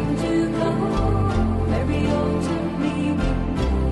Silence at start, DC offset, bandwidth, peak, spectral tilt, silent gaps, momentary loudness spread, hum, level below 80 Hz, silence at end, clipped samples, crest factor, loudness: 0 s; under 0.1%; 11.5 kHz; -10 dBFS; -7.5 dB/octave; none; 3 LU; none; -28 dBFS; 0 s; under 0.1%; 12 dB; -22 LUFS